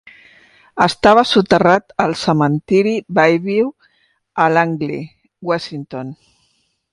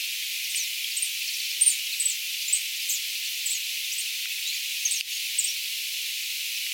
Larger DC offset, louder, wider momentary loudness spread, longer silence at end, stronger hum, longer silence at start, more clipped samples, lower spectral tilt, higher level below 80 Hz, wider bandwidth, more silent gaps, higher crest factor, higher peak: neither; first, -15 LUFS vs -26 LUFS; first, 17 LU vs 6 LU; first, 0.8 s vs 0 s; neither; first, 0.75 s vs 0 s; neither; first, -6 dB/octave vs 14.5 dB/octave; first, -52 dBFS vs under -90 dBFS; second, 11.5 kHz vs 17 kHz; neither; second, 16 dB vs 22 dB; first, 0 dBFS vs -8 dBFS